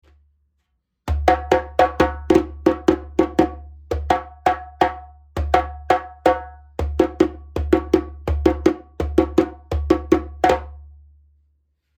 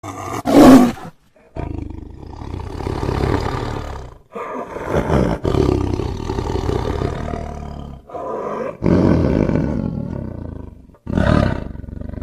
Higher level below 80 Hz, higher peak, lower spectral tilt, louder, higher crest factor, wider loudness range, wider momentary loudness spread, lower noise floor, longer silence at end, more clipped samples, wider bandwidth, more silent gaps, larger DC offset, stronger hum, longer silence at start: about the same, -32 dBFS vs -30 dBFS; about the same, 0 dBFS vs 0 dBFS; about the same, -7 dB/octave vs -7.5 dB/octave; second, -21 LUFS vs -18 LUFS; about the same, 20 dB vs 18 dB; second, 2 LU vs 9 LU; second, 11 LU vs 18 LU; first, -72 dBFS vs -38 dBFS; first, 1.1 s vs 0 s; neither; first, 18 kHz vs 15 kHz; neither; neither; neither; first, 1.05 s vs 0.05 s